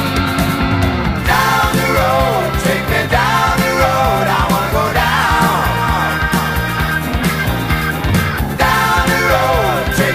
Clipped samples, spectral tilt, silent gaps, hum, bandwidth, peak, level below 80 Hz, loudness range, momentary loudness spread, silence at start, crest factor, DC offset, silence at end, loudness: under 0.1%; -5 dB/octave; none; none; 15.5 kHz; 0 dBFS; -24 dBFS; 2 LU; 4 LU; 0 s; 14 dB; under 0.1%; 0 s; -14 LUFS